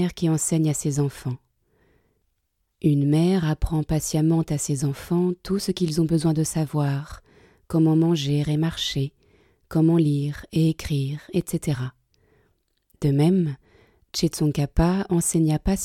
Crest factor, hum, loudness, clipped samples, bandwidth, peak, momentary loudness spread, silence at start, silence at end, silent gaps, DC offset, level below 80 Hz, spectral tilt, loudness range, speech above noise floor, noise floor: 16 dB; none; -23 LUFS; under 0.1%; 15.5 kHz; -6 dBFS; 8 LU; 0 s; 0 s; none; under 0.1%; -40 dBFS; -6 dB/octave; 3 LU; 52 dB; -73 dBFS